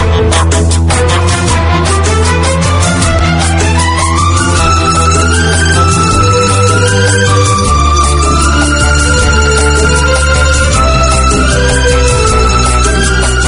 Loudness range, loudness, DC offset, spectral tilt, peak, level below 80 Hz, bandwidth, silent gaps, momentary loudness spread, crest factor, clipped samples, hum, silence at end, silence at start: 1 LU; -8 LUFS; under 0.1%; -4 dB/octave; 0 dBFS; -14 dBFS; 11 kHz; none; 2 LU; 8 dB; 0.3%; none; 0 s; 0 s